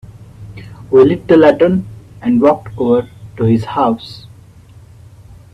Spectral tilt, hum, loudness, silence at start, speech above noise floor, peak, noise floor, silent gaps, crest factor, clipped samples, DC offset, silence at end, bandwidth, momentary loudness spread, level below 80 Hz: -8.5 dB/octave; none; -13 LUFS; 0.4 s; 28 dB; 0 dBFS; -40 dBFS; none; 14 dB; under 0.1%; under 0.1%; 1.35 s; 9.6 kHz; 24 LU; -44 dBFS